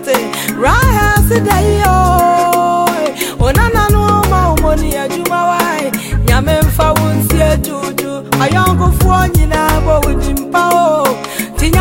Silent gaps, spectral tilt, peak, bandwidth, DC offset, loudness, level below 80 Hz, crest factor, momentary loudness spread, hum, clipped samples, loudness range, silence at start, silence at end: none; -5.5 dB/octave; 0 dBFS; 16.5 kHz; under 0.1%; -12 LUFS; -18 dBFS; 10 dB; 7 LU; none; under 0.1%; 2 LU; 0 s; 0 s